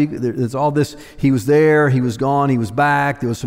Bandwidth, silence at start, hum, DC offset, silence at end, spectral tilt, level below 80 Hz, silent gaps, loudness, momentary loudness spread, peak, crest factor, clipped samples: 16 kHz; 0 s; none; under 0.1%; 0 s; -7 dB/octave; -46 dBFS; none; -16 LUFS; 8 LU; -4 dBFS; 12 dB; under 0.1%